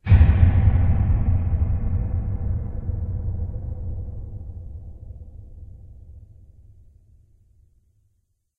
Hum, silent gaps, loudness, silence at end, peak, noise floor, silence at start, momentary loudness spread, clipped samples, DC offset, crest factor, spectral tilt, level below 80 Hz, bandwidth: none; none; -23 LUFS; 2.4 s; -2 dBFS; -70 dBFS; 0.05 s; 25 LU; under 0.1%; under 0.1%; 20 dB; -11.5 dB/octave; -26 dBFS; 3.8 kHz